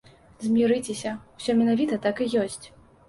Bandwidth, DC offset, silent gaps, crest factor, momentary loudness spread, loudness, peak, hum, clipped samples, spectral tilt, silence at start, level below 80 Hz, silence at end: 11.5 kHz; under 0.1%; none; 14 dB; 11 LU; -25 LUFS; -12 dBFS; none; under 0.1%; -5 dB/octave; 0.4 s; -60 dBFS; 0.4 s